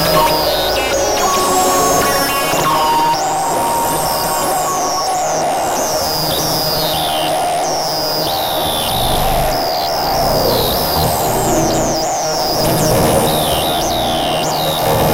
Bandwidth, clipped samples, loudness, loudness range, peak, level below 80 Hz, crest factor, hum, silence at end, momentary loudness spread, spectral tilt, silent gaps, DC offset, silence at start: 16 kHz; under 0.1%; -14 LUFS; 2 LU; -2 dBFS; -30 dBFS; 14 dB; none; 0 s; 4 LU; -3 dB/octave; none; under 0.1%; 0 s